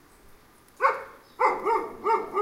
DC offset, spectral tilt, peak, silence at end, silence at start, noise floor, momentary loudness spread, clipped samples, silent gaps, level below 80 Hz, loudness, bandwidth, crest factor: under 0.1%; -4 dB/octave; -8 dBFS; 0 s; 0.8 s; -54 dBFS; 7 LU; under 0.1%; none; -62 dBFS; -26 LUFS; 16 kHz; 20 dB